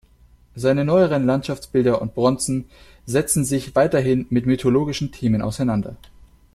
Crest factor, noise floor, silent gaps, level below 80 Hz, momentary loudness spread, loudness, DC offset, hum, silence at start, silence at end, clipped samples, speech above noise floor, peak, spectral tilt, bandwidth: 16 dB; -52 dBFS; none; -46 dBFS; 7 LU; -20 LUFS; under 0.1%; none; 0.55 s; 0.6 s; under 0.1%; 32 dB; -4 dBFS; -6 dB/octave; 14 kHz